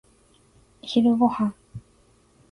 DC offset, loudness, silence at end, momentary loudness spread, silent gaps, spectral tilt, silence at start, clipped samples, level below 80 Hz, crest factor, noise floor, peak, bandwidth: under 0.1%; -22 LUFS; 0.7 s; 25 LU; none; -7 dB/octave; 0.85 s; under 0.1%; -60 dBFS; 18 dB; -59 dBFS; -8 dBFS; 10.5 kHz